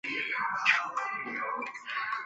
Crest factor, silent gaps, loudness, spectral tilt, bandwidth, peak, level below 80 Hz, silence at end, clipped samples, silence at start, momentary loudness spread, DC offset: 22 dB; none; -30 LUFS; -1.5 dB/octave; 8.2 kHz; -10 dBFS; -80 dBFS; 0 s; under 0.1%; 0.05 s; 9 LU; under 0.1%